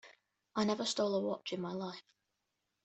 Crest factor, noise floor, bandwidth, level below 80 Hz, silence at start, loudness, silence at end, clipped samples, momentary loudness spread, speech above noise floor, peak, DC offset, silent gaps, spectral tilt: 18 dB; -86 dBFS; 8.2 kHz; -80 dBFS; 0.05 s; -37 LUFS; 0.85 s; under 0.1%; 10 LU; 49 dB; -20 dBFS; under 0.1%; none; -4.5 dB/octave